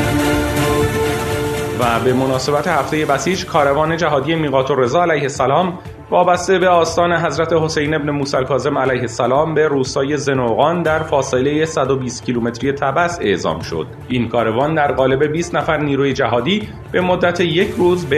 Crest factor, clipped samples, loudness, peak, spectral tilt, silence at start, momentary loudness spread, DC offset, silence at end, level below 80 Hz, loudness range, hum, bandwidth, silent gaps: 16 dB; under 0.1%; -16 LUFS; 0 dBFS; -5.5 dB/octave; 0 s; 5 LU; under 0.1%; 0 s; -40 dBFS; 2 LU; none; 14 kHz; none